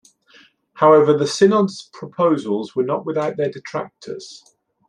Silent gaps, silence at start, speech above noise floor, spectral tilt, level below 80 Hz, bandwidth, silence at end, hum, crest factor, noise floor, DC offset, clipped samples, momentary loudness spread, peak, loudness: none; 0.75 s; 34 dB; -6 dB/octave; -68 dBFS; 10.5 kHz; 0.5 s; none; 18 dB; -52 dBFS; under 0.1%; under 0.1%; 20 LU; -2 dBFS; -18 LUFS